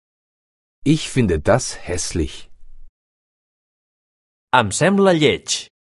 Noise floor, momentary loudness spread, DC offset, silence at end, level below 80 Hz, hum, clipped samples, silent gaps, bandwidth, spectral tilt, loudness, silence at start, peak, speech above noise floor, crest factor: under -90 dBFS; 10 LU; under 0.1%; 0.35 s; -38 dBFS; none; under 0.1%; 2.89-4.47 s; 11.5 kHz; -4.5 dB/octave; -18 LUFS; 0.85 s; 0 dBFS; over 73 dB; 20 dB